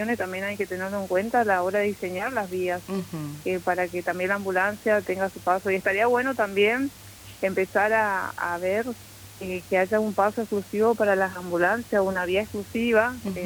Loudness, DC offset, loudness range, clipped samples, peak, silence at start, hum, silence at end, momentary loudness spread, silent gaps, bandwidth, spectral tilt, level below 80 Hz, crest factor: -25 LUFS; under 0.1%; 3 LU; under 0.1%; -8 dBFS; 0 s; none; 0 s; 9 LU; none; over 20 kHz; -5 dB/octave; -58 dBFS; 16 dB